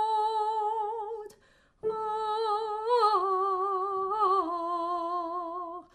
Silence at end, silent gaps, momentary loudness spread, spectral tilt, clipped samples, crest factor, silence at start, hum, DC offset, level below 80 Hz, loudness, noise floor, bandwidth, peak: 0.1 s; none; 11 LU; -4 dB/octave; under 0.1%; 16 dB; 0 s; none; under 0.1%; -70 dBFS; -29 LUFS; -63 dBFS; 11.5 kHz; -14 dBFS